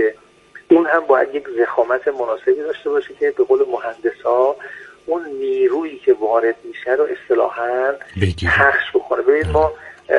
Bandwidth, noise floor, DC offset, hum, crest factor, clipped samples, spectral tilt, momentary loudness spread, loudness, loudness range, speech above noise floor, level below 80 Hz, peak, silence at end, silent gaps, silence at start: 10.5 kHz; -44 dBFS; under 0.1%; none; 18 dB; under 0.1%; -7 dB/octave; 8 LU; -18 LUFS; 2 LU; 27 dB; -44 dBFS; 0 dBFS; 0 s; none; 0 s